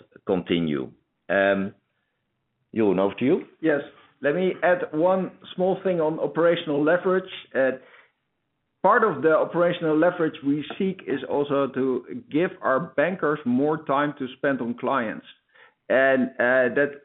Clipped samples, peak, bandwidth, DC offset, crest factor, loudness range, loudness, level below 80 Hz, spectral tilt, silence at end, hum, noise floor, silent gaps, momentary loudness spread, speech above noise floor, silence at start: under 0.1%; -6 dBFS; 4.1 kHz; under 0.1%; 18 dB; 2 LU; -24 LUFS; -68 dBFS; -4.5 dB/octave; 0.05 s; none; -77 dBFS; none; 8 LU; 54 dB; 0.25 s